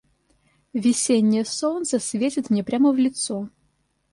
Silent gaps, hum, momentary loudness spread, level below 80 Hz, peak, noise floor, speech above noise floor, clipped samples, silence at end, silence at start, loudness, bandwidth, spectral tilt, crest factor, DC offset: none; none; 9 LU; -64 dBFS; -10 dBFS; -68 dBFS; 47 dB; under 0.1%; 0.65 s; 0.75 s; -22 LUFS; 11.5 kHz; -4.5 dB/octave; 14 dB; under 0.1%